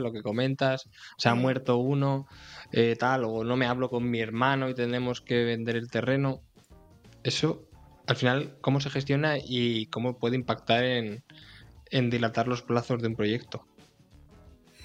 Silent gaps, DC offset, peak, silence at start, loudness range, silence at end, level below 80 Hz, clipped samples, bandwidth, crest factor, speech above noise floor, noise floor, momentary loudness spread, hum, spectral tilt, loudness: none; under 0.1%; -8 dBFS; 0 s; 3 LU; 0 s; -60 dBFS; under 0.1%; 9.2 kHz; 22 dB; 29 dB; -57 dBFS; 8 LU; none; -6 dB/octave; -28 LUFS